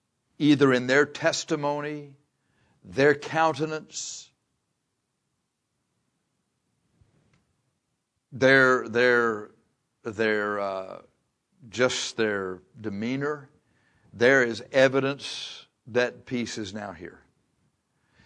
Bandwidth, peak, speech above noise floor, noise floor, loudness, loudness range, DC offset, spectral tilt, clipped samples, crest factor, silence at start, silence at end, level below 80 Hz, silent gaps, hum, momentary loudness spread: 10.5 kHz; -6 dBFS; 54 dB; -78 dBFS; -25 LUFS; 7 LU; under 0.1%; -4.5 dB/octave; under 0.1%; 22 dB; 0.4 s; 1.15 s; -70 dBFS; none; none; 18 LU